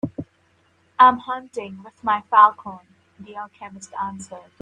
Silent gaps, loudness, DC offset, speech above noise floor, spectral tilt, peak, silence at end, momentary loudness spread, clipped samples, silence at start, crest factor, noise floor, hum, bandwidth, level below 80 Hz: none; -19 LUFS; under 0.1%; 41 dB; -4.5 dB/octave; 0 dBFS; 0.2 s; 23 LU; under 0.1%; 0.05 s; 22 dB; -62 dBFS; none; 9.6 kHz; -66 dBFS